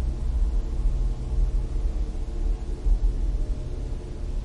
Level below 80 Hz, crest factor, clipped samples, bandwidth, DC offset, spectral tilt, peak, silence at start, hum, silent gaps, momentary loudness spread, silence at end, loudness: -24 dBFS; 12 dB; under 0.1%; 7.4 kHz; 0.4%; -7.5 dB/octave; -12 dBFS; 0 s; none; none; 7 LU; 0 s; -30 LUFS